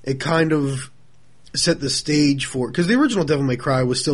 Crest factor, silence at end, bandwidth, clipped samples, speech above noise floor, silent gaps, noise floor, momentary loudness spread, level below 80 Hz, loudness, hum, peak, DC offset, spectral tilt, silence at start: 16 dB; 0 s; 11.5 kHz; under 0.1%; 37 dB; none; -56 dBFS; 7 LU; -48 dBFS; -19 LUFS; none; -4 dBFS; 0.6%; -5 dB/octave; 0.05 s